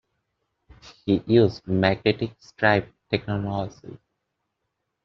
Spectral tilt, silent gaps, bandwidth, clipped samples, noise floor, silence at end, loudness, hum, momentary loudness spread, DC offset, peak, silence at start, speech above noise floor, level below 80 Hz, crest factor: -5 dB/octave; none; 7 kHz; under 0.1%; -79 dBFS; 1.1 s; -23 LUFS; none; 13 LU; under 0.1%; -4 dBFS; 0.85 s; 56 dB; -56 dBFS; 22 dB